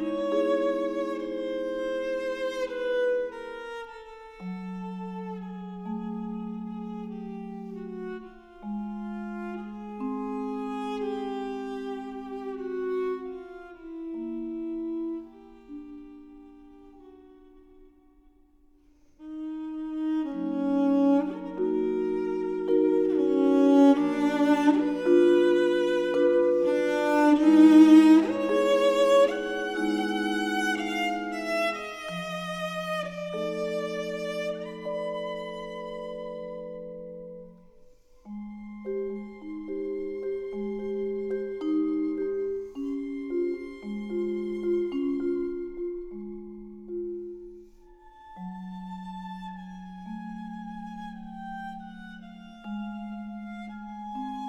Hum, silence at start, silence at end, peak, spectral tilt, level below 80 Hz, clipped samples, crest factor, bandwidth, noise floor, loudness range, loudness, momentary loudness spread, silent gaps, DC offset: none; 0 s; 0 s; -6 dBFS; -6 dB/octave; -58 dBFS; under 0.1%; 22 dB; 12 kHz; -59 dBFS; 19 LU; -27 LUFS; 19 LU; none; under 0.1%